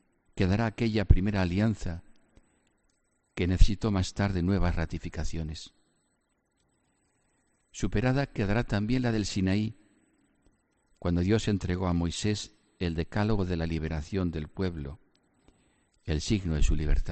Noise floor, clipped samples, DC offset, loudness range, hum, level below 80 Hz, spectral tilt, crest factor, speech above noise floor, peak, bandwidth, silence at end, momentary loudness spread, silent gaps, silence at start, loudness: -75 dBFS; under 0.1%; under 0.1%; 4 LU; none; -34 dBFS; -6.5 dB/octave; 24 dB; 48 dB; -6 dBFS; 8.8 kHz; 0 s; 10 LU; none; 0.35 s; -30 LUFS